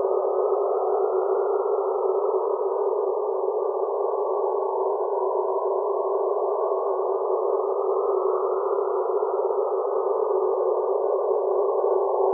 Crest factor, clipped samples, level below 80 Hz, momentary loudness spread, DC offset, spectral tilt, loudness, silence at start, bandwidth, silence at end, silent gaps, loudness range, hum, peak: 14 dB; under 0.1%; under -90 dBFS; 2 LU; under 0.1%; -7 dB/octave; -24 LUFS; 0 s; 1.6 kHz; 0 s; none; 1 LU; none; -10 dBFS